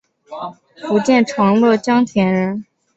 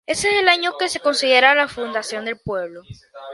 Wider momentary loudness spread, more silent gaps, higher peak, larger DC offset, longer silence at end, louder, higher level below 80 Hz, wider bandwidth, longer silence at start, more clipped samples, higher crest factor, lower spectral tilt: first, 17 LU vs 14 LU; neither; about the same, -2 dBFS vs 0 dBFS; neither; first, 0.35 s vs 0 s; first, -15 LUFS vs -18 LUFS; about the same, -56 dBFS vs -54 dBFS; second, 8.2 kHz vs 11.5 kHz; first, 0.3 s vs 0.1 s; neither; second, 14 dB vs 20 dB; first, -6.5 dB/octave vs -2 dB/octave